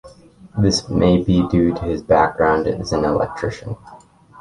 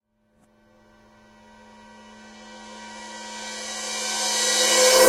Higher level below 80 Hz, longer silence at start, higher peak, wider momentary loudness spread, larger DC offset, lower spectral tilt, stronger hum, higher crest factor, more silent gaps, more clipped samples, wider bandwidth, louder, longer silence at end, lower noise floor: first, -36 dBFS vs -62 dBFS; second, 0.05 s vs 2.25 s; about the same, -2 dBFS vs -2 dBFS; second, 13 LU vs 26 LU; neither; first, -6 dB/octave vs 0.5 dB/octave; neither; second, 16 dB vs 24 dB; neither; neither; second, 11.5 kHz vs 16 kHz; first, -18 LUFS vs -21 LUFS; first, 0.45 s vs 0 s; second, -44 dBFS vs -64 dBFS